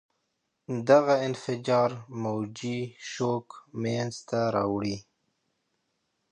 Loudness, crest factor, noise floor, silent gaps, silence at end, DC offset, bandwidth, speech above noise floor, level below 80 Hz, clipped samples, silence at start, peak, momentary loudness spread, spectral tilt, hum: -28 LUFS; 22 dB; -79 dBFS; none; 1.3 s; under 0.1%; 10.5 kHz; 51 dB; -66 dBFS; under 0.1%; 0.7 s; -6 dBFS; 13 LU; -6 dB/octave; none